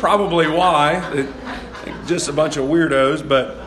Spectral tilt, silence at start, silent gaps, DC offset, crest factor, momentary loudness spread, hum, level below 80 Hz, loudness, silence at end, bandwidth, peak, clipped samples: -4.5 dB/octave; 0 s; none; under 0.1%; 16 dB; 15 LU; none; -42 dBFS; -17 LUFS; 0 s; 12.5 kHz; -2 dBFS; under 0.1%